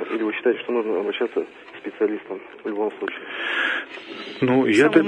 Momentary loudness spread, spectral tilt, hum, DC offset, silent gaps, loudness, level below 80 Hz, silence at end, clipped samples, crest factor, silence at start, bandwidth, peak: 16 LU; -5.5 dB/octave; none; under 0.1%; none; -23 LUFS; -70 dBFS; 0 s; under 0.1%; 22 dB; 0 s; 10.5 kHz; -2 dBFS